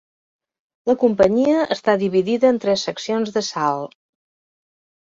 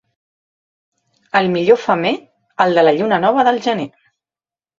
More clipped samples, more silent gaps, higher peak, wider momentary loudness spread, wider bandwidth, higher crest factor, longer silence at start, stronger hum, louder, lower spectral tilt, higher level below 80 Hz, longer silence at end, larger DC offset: neither; neither; about the same, -2 dBFS vs 0 dBFS; second, 8 LU vs 11 LU; about the same, 7.8 kHz vs 7.6 kHz; about the same, 18 dB vs 18 dB; second, 0.85 s vs 1.35 s; neither; second, -19 LUFS vs -15 LUFS; about the same, -5 dB/octave vs -6 dB/octave; about the same, -58 dBFS vs -62 dBFS; first, 1.25 s vs 0.9 s; neither